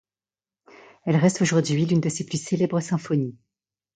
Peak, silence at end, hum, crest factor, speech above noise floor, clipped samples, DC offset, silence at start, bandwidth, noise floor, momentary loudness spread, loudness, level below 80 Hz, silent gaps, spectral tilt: -6 dBFS; 0.6 s; none; 18 dB; over 68 dB; under 0.1%; under 0.1%; 1.05 s; 9.4 kHz; under -90 dBFS; 8 LU; -23 LUFS; -64 dBFS; none; -6 dB/octave